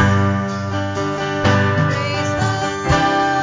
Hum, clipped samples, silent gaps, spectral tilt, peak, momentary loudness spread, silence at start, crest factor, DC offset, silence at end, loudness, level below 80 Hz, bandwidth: none; under 0.1%; none; -5.5 dB/octave; 0 dBFS; 6 LU; 0 s; 16 dB; under 0.1%; 0 s; -18 LUFS; -34 dBFS; 7.6 kHz